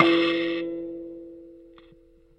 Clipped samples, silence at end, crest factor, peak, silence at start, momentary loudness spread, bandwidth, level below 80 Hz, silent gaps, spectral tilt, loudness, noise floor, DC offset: under 0.1%; 0.8 s; 26 dB; -2 dBFS; 0 s; 25 LU; 5.8 kHz; -62 dBFS; none; -6 dB/octave; -25 LUFS; -55 dBFS; under 0.1%